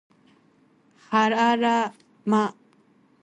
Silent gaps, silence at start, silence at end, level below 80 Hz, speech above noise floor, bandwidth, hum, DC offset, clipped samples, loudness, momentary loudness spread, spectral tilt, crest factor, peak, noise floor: none; 1.1 s; 0.7 s; -74 dBFS; 39 dB; 9 kHz; none; under 0.1%; under 0.1%; -23 LUFS; 10 LU; -5 dB/octave; 16 dB; -8 dBFS; -60 dBFS